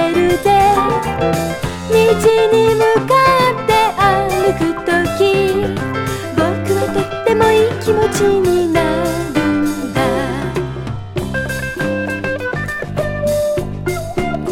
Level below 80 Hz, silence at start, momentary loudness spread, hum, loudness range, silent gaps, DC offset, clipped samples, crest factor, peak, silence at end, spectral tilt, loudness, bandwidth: -36 dBFS; 0 s; 9 LU; none; 7 LU; none; under 0.1%; under 0.1%; 14 dB; 0 dBFS; 0 s; -5.5 dB/octave; -15 LUFS; 17 kHz